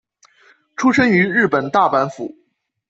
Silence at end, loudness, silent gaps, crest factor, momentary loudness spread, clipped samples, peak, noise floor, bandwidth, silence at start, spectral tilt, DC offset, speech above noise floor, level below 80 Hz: 0.6 s; -16 LUFS; none; 16 dB; 18 LU; under 0.1%; -2 dBFS; -54 dBFS; 8 kHz; 0.8 s; -6 dB/octave; under 0.1%; 38 dB; -60 dBFS